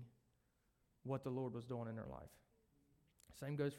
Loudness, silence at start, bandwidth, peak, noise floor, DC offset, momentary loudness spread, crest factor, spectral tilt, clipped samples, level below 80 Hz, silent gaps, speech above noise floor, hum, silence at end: -48 LUFS; 0 s; 16 kHz; -30 dBFS; -81 dBFS; under 0.1%; 20 LU; 18 dB; -7.5 dB/octave; under 0.1%; -74 dBFS; none; 35 dB; none; 0 s